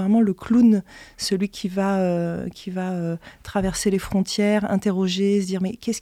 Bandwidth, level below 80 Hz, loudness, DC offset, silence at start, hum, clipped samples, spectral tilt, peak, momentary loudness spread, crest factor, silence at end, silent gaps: 14.5 kHz; -48 dBFS; -22 LUFS; under 0.1%; 0 s; none; under 0.1%; -5.5 dB/octave; -8 dBFS; 11 LU; 14 dB; 0 s; none